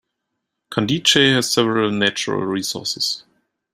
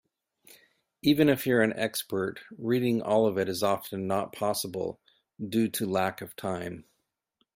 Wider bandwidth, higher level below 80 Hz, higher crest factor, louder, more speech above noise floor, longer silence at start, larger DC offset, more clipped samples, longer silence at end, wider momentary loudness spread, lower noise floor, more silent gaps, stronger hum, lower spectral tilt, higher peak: about the same, 16 kHz vs 16 kHz; first, -58 dBFS vs -66 dBFS; about the same, 20 dB vs 20 dB; first, -18 LUFS vs -28 LUFS; first, 59 dB vs 48 dB; second, 0.7 s vs 1.05 s; neither; neither; second, 0.55 s vs 0.75 s; second, 10 LU vs 13 LU; about the same, -78 dBFS vs -76 dBFS; neither; neither; second, -3.5 dB/octave vs -5 dB/octave; first, 0 dBFS vs -10 dBFS